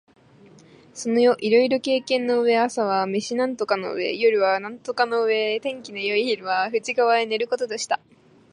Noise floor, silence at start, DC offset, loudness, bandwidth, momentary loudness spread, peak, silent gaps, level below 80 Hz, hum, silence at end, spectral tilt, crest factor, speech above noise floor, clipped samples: -51 dBFS; 0.95 s; under 0.1%; -22 LUFS; 11 kHz; 8 LU; -6 dBFS; none; -74 dBFS; none; 0.55 s; -3.5 dB/octave; 18 dB; 29 dB; under 0.1%